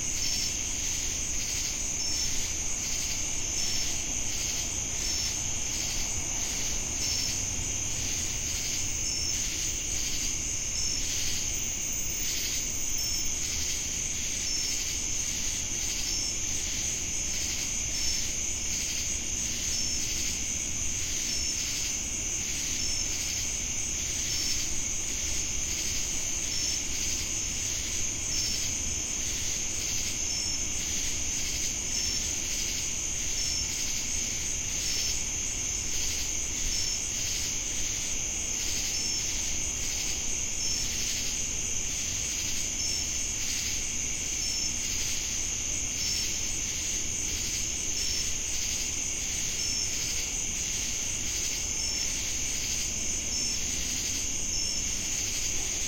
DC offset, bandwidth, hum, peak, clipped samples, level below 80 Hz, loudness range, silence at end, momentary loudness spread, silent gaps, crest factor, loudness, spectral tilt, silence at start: under 0.1%; 16.5 kHz; none; -16 dBFS; under 0.1%; -42 dBFS; 0 LU; 0 s; 2 LU; none; 16 dB; -28 LUFS; -0.5 dB/octave; 0 s